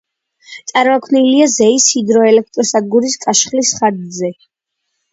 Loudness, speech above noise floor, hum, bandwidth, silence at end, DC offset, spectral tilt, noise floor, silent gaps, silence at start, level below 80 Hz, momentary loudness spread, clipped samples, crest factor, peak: -12 LUFS; 60 dB; none; 8 kHz; 0.8 s; under 0.1%; -2.5 dB/octave; -72 dBFS; none; 0.5 s; -60 dBFS; 11 LU; under 0.1%; 14 dB; 0 dBFS